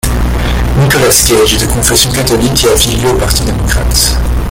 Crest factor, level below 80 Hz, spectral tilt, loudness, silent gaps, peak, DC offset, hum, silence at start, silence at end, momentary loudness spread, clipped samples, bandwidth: 10 dB; -16 dBFS; -3.5 dB/octave; -9 LUFS; none; 0 dBFS; under 0.1%; none; 0.05 s; 0 s; 7 LU; 0.2%; over 20 kHz